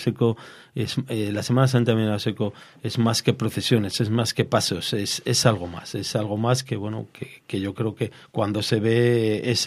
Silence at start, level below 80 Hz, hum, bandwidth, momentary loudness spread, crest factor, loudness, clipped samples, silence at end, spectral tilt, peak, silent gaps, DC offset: 0 s; -60 dBFS; none; 15.5 kHz; 11 LU; 22 dB; -23 LUFS; under 0.1%; 0 s; -5 dB/octave; -2 dBFS; none; under 0.1%